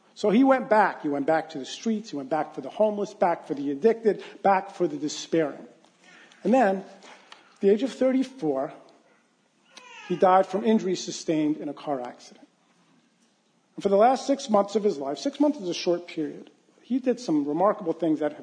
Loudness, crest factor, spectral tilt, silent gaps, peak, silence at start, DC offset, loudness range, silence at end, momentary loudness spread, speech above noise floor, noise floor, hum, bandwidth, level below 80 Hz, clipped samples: -25 LUFS; 18 dB; -5.5 dB/octave; none; -8 dBFS; 0.15 s; under 0.1%; 3 LU; 0 s; 12 LU; 42 dB; -66 dBFS; none; 10 kHz; -80 dBFS; under 0.1%